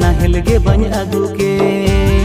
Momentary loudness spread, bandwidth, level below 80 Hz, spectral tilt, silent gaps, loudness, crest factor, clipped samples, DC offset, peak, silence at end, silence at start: 4 LU; 15.5 kHz; -16 dBFS; -6.5 dB/octave; none; -14 LUFS; 12 dB; under 0.1%; under 0.1%; 0 dBFS; 0 s; 0 s